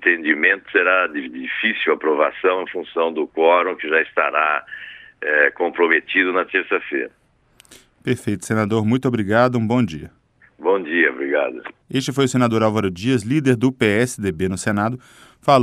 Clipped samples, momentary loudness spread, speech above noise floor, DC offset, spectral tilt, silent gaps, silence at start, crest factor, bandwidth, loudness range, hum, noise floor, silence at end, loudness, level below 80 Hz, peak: under 0.1%; 10 LU; 36 dB; under 0.1%; -5.5 dB/octave; none; 0 s; 18 dB; 14.5 kHz; 3 LU; none; -54 dBFS; 0 s; -19 LUFS; -58 dBFS; 0 dBFS